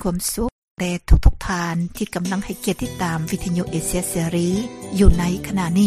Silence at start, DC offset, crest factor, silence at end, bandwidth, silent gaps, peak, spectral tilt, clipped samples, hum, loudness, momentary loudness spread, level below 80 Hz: 0 s; under 0.1%; 18 dB; 0 s; 15.5 kHz; 0.52-0.75 s; -2 dBFS; -5.5 dB/octave; under 0.1%; none; -22 LUFS; 8 LU; -24 dBFS